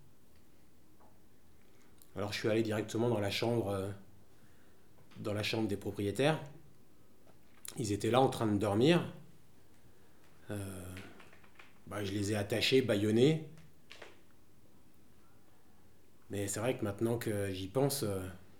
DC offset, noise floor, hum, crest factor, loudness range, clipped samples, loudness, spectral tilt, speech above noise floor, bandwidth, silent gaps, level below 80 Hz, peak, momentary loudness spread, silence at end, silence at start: 0.2%; -66 dBFS; none; 24 dB; 7 LU; under 0.1%; -34 LUFS; -5.5 dB/octave; 33 dB; over 20 kHz; none; -72 dBFS; -12 dBFS; 20 LU; 0.2 s; 2.15 s